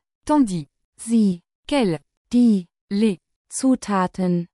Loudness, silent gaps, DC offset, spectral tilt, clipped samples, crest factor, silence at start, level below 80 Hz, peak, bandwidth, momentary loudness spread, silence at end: -21 LUFS; 0.85-0.93 s, 1.55-1.63 s, 2.17-2.25 s, 2.81-2.88 s, 3.36-3.45 s; under 0.1%; -6 dB/octave; under 0.1%; 14 dB; 0.25 s; -52 dBFS; -8 dBFS; 12 kHz; 12 LU; 0.1 s